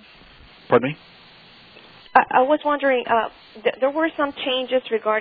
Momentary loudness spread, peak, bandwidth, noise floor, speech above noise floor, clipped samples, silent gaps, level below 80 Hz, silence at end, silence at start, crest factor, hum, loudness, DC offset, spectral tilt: 8 LU; 0 dBFS; 4.9 kHz; -48 dBFS; 27 dB; under 0.1%; none; -60 dBFS; 0 s; 0.7 s; 22 dB; none; -21 LUFS; under 0.1%; -8 dB/octave